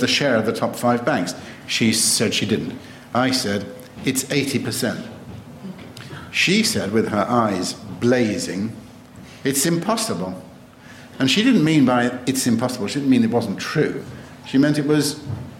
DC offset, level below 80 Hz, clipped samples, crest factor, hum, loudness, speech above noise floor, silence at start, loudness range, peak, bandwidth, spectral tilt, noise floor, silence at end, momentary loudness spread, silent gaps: under 0.1%; -56 dBFS; under 0.1%; 14 dB; none; -20 LUFS; 23 dB; 0 s; 4 LU; -6 dBFS; 16.5 kHz; -4 dB/octave; -43 dBFS; 0 s; 20 LU; none